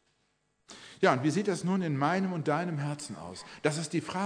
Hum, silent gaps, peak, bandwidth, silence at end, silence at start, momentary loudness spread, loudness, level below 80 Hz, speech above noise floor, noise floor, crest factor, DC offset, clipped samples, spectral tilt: none; none; -10 dBFS; 10.5 kHz; 0 s; 0.7 s; 15 LU; -30 LUFS; -74 dBFS; 45 dB; -75 dBFS; 22 dB; under 0.1%; under 0.1%; -5.5 dB/octave